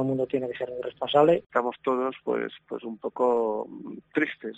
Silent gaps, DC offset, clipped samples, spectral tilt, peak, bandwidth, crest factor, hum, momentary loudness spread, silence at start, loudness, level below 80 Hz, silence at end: 1.46-1.50 s; under 0.1%; under 0.1%; -7.5 dB/octave; -8 dBFS; 8 kHz; 20 dB; none; 14 LU; 0 s; -27 LUFS; -70 dBFS; 0 s